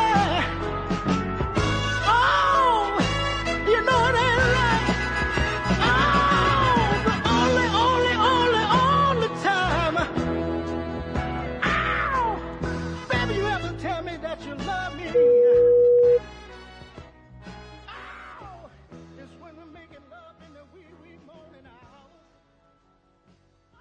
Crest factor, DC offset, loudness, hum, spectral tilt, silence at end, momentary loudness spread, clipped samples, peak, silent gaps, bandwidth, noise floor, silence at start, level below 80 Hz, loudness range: 16 dB; under 0.1%; -22 LUFS; none; -5.5 dB/octave; 3.2 s; 14 LU; under 0.1%; -8 dBFS; none; 10 kHz; -62 dBFS; 0 s; -38 dBFS; 6 LU